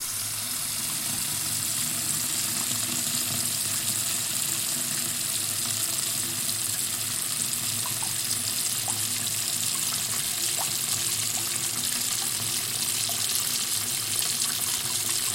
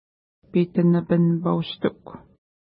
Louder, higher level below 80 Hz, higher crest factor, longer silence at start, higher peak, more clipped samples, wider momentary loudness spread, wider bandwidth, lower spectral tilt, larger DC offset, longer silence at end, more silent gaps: second, -25 LUFS vs -22 LUFS; about the same, -64 dBFS vs -60 dBFS; first, 22 dB vs 16 dB; second, 0 s vs 0.55 s; about the same, -6 dBFS vs -8 dBFS; neither; second, 2 LU vs 8 LU; first, 17 kHz vs 5 kHz; second, 0 dB/octave vs -12.5 dB/octave; neither; second, 0 s vs 0.5 s; neither